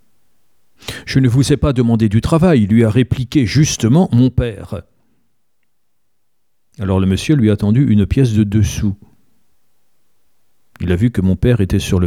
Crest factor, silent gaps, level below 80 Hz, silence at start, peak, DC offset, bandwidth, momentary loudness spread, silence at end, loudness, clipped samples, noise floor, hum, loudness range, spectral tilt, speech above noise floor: 14 dB; none; -32 dBFS; 0.85 s; 0 dBFS; 0.2%; 14.5 kHz; 13 LU; 0 s; -14 LUFS; under 0.1%; -72 dBFS; none; 6 LU; -6.5 dB/octave; 60 dB